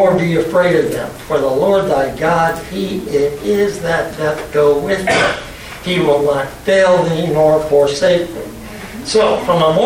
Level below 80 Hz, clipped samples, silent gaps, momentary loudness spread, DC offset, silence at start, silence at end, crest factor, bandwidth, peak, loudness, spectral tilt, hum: -40 dBFS; under 0.1%; none; 10 LU; under 0.1%; 0 s; 0 s; 12 dB; 16.5 kHz; -2 dBFS; -14 LUFS; -5 dB/octave; none